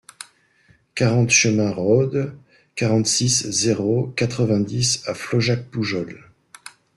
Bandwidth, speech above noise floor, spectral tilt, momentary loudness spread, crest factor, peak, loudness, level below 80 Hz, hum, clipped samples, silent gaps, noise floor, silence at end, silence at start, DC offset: 12.5 kHz; 38 dB; -4 dB/octave; 17 LU; 18 dB; -4 dBFS; -20 LUFS; -54 dBFS; none; under 0.1%; none; -58 dBFS; 0.25 s; 0.2 s; under 0.1%